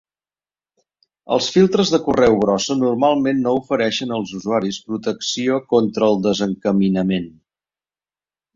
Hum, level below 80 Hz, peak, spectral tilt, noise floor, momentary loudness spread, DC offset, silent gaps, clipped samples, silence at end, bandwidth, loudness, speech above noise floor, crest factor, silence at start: none; -52 dBFS; -2 dBFS; -5.5 dB/octave; under -90 dBFS; 9 LU; under 0.1%; none; under 0.1%; 1.25 s; 7.6 kHz; -18 LUFS; over 72 dB; 18 dB; 1.3 s